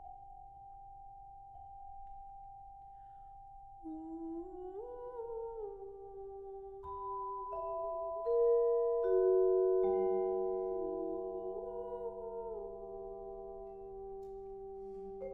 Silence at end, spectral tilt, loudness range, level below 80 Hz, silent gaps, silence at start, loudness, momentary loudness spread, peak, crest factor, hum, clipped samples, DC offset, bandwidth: 0 s; -10.5 dB/octave; 19 LU; -62 dBFS; none; 0 s; -37 LUFS; 23 LU; -22 dBFS; 16 dB; none; under 0.1%; under 0.1%; 2.3 kHz